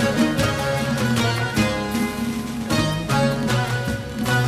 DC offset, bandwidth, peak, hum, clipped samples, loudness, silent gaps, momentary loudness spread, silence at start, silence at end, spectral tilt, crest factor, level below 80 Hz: under 0.1%; 15.5 kHz; -6 dBFS; none; under 0.1%; -22 LUFS; none; 6 LU; 0 s; 0 s; -5 dB/octave; 14 dB; -40 dBFS